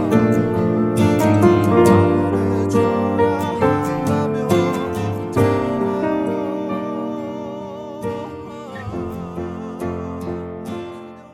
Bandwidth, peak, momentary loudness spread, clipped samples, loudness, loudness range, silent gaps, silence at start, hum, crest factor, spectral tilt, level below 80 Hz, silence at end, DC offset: 16.5 kHz; 0 dBFS; 15 LU; under 0.1%; -19 LUFS; 12 LU; none; 0 s; none; 18 dB; -7.5 dB/octave; -46 dBFS; 0 s; under 0.1%